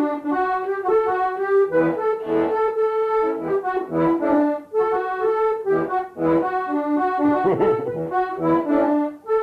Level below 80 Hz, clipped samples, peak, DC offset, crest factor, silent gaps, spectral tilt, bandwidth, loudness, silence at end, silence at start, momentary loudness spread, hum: -56 dBFS; under 0.1%; -8 dBFS; under 0.1%; 12 dB; none; -8.5 dB/octave; 5.2 kHz; -21 LUFS; 0 s; 0 s; 4 LU; none